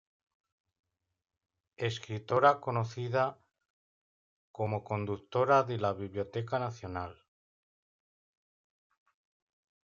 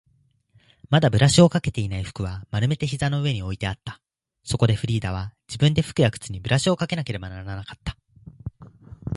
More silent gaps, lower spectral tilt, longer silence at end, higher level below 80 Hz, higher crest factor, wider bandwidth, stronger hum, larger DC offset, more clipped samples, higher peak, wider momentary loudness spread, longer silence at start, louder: first, 3.70-4.54 s vs none; about the same, -6.5 dB/octave vs -5.5 dB/octave; first, 2.7 s vs 0 s; second, -76 dBFS vs -44 dBFS; about the same, 24 dB vs 22 dB; second, 7.6 kHz vs 11.5 kHz; neither; neither; neither; second, -10 dBFS vs -2 dBFS; second, 12 LU vs 19 LU; first, 1.8 s vs 0.9 s; second, -32 LUFS vs -23 LUFS